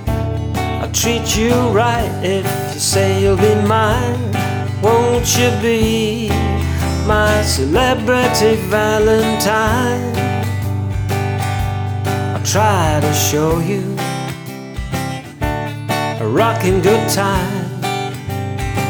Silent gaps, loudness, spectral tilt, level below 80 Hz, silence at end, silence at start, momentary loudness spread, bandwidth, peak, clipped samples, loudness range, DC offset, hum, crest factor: none; -16 LUFS; -5 dB/octave; -30 dBFS; 0 s; 0 s; 8 LU; over 20 kHz; 0 dBFS; under 0.1%; 4 LU; under 0.1%; none; 16 dB